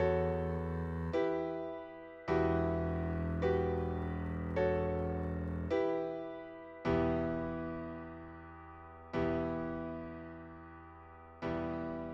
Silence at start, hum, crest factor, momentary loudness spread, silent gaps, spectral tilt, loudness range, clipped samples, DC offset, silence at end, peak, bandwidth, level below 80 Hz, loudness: 0 s; none; 18 dB; 18 LU; none; -9 dB/octave; 6 LU; under 0.1%; under 0.1%; 0 s; -20 dBFS; 7 kHz; -50 dBFS; -37 LUFS